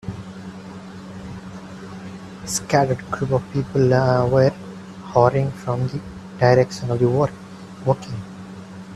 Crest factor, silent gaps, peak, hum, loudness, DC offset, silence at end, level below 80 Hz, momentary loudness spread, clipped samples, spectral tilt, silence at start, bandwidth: 20 dB; none; 0 dBFS; none; -20 LUFS; under 0.1%; 0 s; -50 dBFS; 20 LU; under 0.1%; -6.5 dB/octave; 0.05 s; 13 kHz